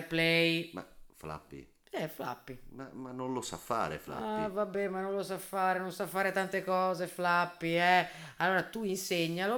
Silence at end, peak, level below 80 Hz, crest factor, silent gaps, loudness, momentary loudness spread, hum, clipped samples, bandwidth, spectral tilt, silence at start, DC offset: 0 s; -14 dBFS; -64 dBFS; 20 dB; none; -32 LUFS; 18 LU; none; under 0.1%; over 20 kHz; -4.5 dB/octave; 0 s; under 0.1%